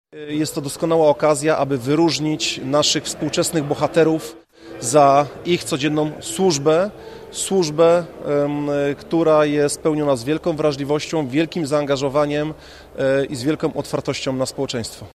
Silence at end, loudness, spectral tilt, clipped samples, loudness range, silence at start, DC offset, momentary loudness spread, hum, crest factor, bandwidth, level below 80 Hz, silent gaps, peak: 0.05 s; -19 LUFS; -4.5 dB/octave; under 0.1%; 3 LU; 0.15 s; under 0.1%; 9 LU; none; 18 dB; 15 kHz; -52 dBFS; none; -2 dBFS